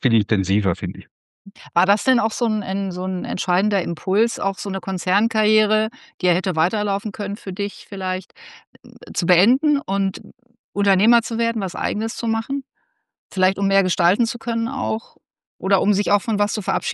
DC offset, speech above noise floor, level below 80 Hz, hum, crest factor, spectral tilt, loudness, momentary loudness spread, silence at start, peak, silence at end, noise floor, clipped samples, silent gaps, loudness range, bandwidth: under 0.1%; 50 dB; -60 dBFS; none; 18 dB; -5 dB/octave; -21 LUFS; 11 LU; 0 s; -2 dBFS; 0 s; -71 dBFS; under 0.1%; 1.11-1.45 s, 6.14-6.18 s, 8.67-8.73 s, 10.59-10.73 s, 13.18-13.30 s, 15.47-15.59 s; 2 LU; 12 kHz